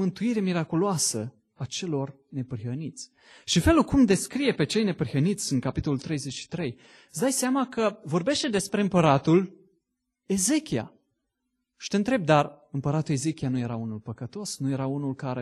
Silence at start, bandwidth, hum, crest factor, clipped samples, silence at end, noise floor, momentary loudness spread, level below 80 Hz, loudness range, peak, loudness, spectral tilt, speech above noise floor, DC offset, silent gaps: 0 s; 12.5 kHz; none; 20 dB; under 0.1%; 0 s; -80 dBFS; 14 LU; -48 dBFS; 3 LU; -6 dBFS; -26 LUFS; -5 dB/octave; 54 dB; under 0.1%; none